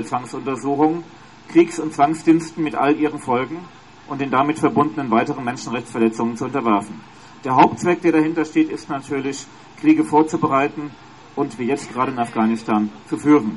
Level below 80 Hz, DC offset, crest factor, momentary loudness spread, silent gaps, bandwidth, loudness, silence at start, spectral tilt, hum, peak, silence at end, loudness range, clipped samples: -60 dBFS; 0.2%; 18 dB; 12 LU; none; 11.5 kHz; -19 LUFS; 0 s; -6 dB/octave; none; -2 dBFS; 0 s; 2 LU; under 0.1%